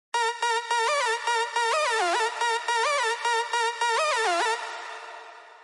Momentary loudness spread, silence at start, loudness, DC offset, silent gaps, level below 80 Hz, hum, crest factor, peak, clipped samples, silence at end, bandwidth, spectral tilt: 11 LU; 0.15 s; -25 LUFS; under 0.1%; none; under -90 dBFS; none; 14 dB; -14 dBFS; under 0.1%; 0 s; 11.5 kHz; 3.5 dB/octave